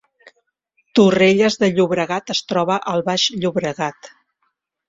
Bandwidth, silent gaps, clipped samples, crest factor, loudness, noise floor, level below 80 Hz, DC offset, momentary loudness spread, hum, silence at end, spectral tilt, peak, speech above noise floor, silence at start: 7.8 kHz; none; under 0.1%; 18 dB; -17 LUFS; -71 dBFS; -58 dBFS; under 0.1%; 9 LU; none; 0.8 s; -4.5 dB/octave; -2 dBFS; 53 dB; 0.95 s